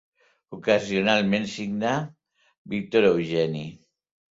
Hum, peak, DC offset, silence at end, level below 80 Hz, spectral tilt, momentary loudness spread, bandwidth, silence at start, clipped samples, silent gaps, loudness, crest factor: none; -4 dBFS; under 0.1%; 0.55 s; -62 dBFS; -5.5 dB/octave; 14 LU; 7.8 kHz; 0.5 s; under 0.1%; 2.58-2.65 s; -24 LUFS; 20 dB